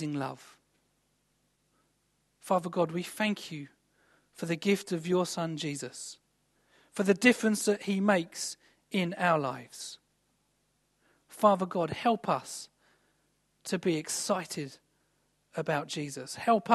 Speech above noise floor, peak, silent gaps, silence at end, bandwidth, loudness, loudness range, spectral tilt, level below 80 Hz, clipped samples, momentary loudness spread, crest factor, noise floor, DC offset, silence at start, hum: 44 dB; -8 dBFS; none; 0 s; 12.5 kHz; -30 LUFS; 6 LU; -4.5 dB/octave; -76 dBFS; under 0.1%; 17 LU; 24 dB; -74 dBFS; under 0.1%; 0 s; 50 Hz at -60 dBFS